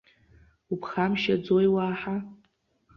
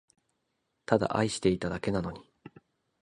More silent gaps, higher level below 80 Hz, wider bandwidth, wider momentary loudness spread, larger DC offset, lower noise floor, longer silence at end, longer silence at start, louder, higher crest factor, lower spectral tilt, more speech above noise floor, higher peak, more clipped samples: neither; second, -60 dBFS vs -54 dBFS; second, 6.6 kHz vs 11 kHz; second, 12 LU vs 16 LU; neither; second, -69 dBFS vs -79 dBFS; about the same, 0.6 s vs 0.6 s; second, 0.7 s vs 0.9 s; first, -27 LUFS vs -30 LUFS; second, 16 dB vs 26 dB; first, -7.5 dB/octave vs -5.5 dB/octave; second, 43 dB vs 51 dB; second, -12 dBFS vs -8 dBFS; neither